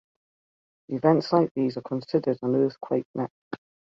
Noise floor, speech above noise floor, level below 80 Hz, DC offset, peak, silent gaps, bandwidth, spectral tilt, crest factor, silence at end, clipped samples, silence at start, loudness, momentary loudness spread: under -90 dBFS; over 65 dB; -70 dBFS; under 0.1%; -6 dBFS; 1.51-1.55 s, 3.05-3.14 s, 3.30-3.51 s; 7.4 kHz; -8.5 dB/octave; 20 dB; 0.45 s; under 0.1%; 0.9 s; -26 LUFS; 14 LU